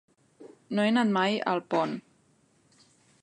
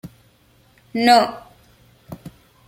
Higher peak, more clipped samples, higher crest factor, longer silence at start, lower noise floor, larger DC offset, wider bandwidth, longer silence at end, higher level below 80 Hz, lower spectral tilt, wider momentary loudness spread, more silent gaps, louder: second, -12 dBFS vs -2 dBFS; neither; about the same, 18 dB vs 22 dB; first, 0.4 s vs 0.05 s; first, -66 dBFS vs -56 dBFS; neither; second, 9.6 kHz vs 16 kHz; first, 1.25 s vs 0.4 s; second, -82 dBFS vs -58 dBFS; first, -6 dB/octave vs -4 dB/octave; second, 9 LU vs 26 LU; neither; second, -27 LUFS vs -17 LUFS